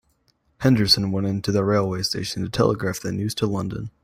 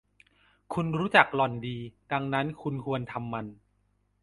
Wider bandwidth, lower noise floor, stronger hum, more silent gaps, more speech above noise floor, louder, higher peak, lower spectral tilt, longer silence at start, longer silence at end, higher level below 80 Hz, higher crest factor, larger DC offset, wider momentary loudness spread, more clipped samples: first, 16 kHz vs 11.5 kHz; second, -66 dBFS vs -71 dBFS; second, none vs 50 Hz at -55 dBFS; neither; about the same, 44 dB vs 42 dB; first, -22 LUFS vs -28 LUFS; about the same, -4 dBFS vs -2 dBFS; second, -5.5 dB/octave vs -7 dB/octave; about the same, 0.6 s vs 0.7 s; second, 0.15 s vs 0.7 s; first, -48 dBFS vs -62 dBFS; second, 18 dB vs 28 dB; neither; second, 9 LU vs 16 LU; neither